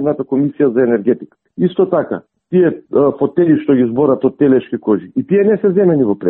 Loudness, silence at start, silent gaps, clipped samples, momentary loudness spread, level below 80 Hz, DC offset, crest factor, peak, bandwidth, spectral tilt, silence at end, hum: -14 LUFS; 0 s; none; under 0.1%; 6 LU; -56 dBFS; under 0.1%; 12 dB; 0 dBFS; 3.9 kHz; -13.5 dB/octave; 0 s; none